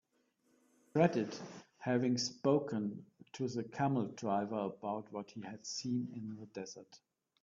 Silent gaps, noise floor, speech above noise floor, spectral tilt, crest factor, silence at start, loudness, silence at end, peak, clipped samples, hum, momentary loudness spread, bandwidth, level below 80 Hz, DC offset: none; -77 dBFS; 40 dB; -5.5 dB/octave; 22 dB; 0.95 s; -37 LUFS; 0.45 s; -16 dBFS; under 0.1%; none; 15 LU; 7.6 kHz; -78 dBFS; under 0.1%